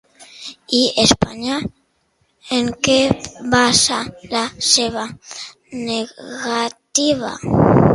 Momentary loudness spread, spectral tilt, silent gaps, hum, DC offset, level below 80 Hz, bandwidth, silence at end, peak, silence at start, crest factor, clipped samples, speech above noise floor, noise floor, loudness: 18 LU; -3.5 dB/octave; none; none; under 0.1%; -42 dBFS; 11.5 kHz; 0 s; 0 dBFS; 0.2 s; 18 dB; under 0.1%; 46 dB; -64 dBFS; -17 LUFS